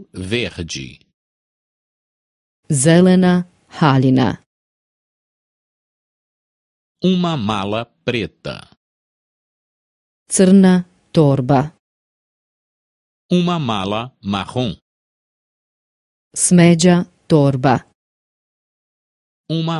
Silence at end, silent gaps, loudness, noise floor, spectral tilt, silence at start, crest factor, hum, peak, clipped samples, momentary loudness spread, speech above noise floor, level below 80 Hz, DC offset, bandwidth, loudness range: 0 s; 1.14-2.63 s, 4.46-6.95 s, 8.77-10.26 s, 11.79-13.29 s, 14.82-16.31 s, 17.95-19.44 s; -16 LUFS; under -90 dBFS; -5.5 dB/octave; 0 s; 18 dB; none; 0 dBFS; under 0.1%; 16 LU; over 75 dB; -50 dBFS; under 0.1%; 11.5 kHz; 7 LU